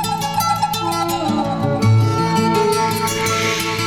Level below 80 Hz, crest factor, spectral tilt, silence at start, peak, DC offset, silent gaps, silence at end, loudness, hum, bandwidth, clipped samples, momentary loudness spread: -44 dBFS; 14 dB; -5 dB/octave; 0 s; -4 dBFS; under 0.1%; none; 0 s; -17 LUFS; none; 19 kHz; under 0.1%; 4 LU